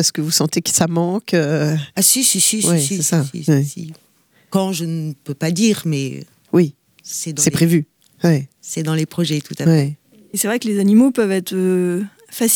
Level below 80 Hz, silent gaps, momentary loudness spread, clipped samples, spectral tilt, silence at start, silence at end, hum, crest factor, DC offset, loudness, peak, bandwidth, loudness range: -60 dBFS; none; 12 LU; under 0.1%; -4.5 dB/octave; 0 s; 0 s; none; 16 dB; under 0.1%; -17 LUFS; -2 dBFS; over 20 kHz; 5 LU